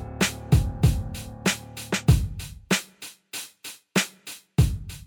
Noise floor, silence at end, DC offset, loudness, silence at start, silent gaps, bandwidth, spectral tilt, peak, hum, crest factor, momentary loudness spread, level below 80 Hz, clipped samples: -45 dBFS; 0.05 s; under 0.1%; -26 LUFS; 0 s; none; 19 kHz; -4.5 dB/octave; -4 dBFS; none; 20 dB; 16 LU; -32 dBFS; under 0.1%